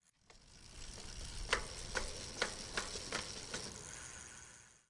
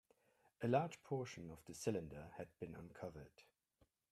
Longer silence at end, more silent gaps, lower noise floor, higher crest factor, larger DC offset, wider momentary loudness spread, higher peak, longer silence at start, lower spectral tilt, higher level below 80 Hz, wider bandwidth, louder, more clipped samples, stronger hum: second, 0.1 s vs 0.7 s; neither; second, -65 dBFS vs -80 dBFS; about the same, 28 dB vs 26 dB; neither; about the same, 15 LU vs 15 LU; first, -18 dBFS vs -22 dBFS; second, 0.3 s vs 0.6 s; second, -1.5 dB/octave vs -6 dB/octave; first, -54 dBFS vs -74 dBFS; second, 11.5 kHz vs 15 kHz; first, -43 LUFS vs -46 LUFS; neither; neither